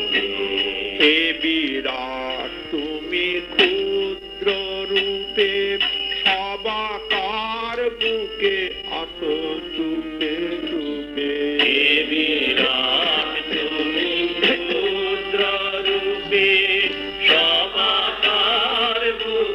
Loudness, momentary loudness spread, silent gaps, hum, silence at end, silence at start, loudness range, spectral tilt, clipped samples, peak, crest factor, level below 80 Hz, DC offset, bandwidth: -19 LUFS; 10 LU; none; none; 0 s; 0 s; 6 LU; -4 dB/octave; under 0.1%; -4 dBFS; 18 dB; -50 dBFS; under 0.1%; 12.5 kHz